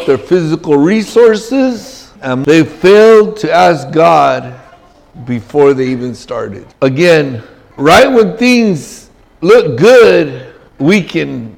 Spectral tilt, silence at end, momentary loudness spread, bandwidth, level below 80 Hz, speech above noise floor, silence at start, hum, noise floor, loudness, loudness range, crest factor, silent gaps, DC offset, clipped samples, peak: -5.5 dB/octave; 0.05 s; 15 LU; 16.5 kHz; -44 dBFS; 32 dB; 0 s; none; -41 dBFS; -9 LUFS; 4 LU; 10 dB; none; under 0.1%; under 0.1%; 0 dBFS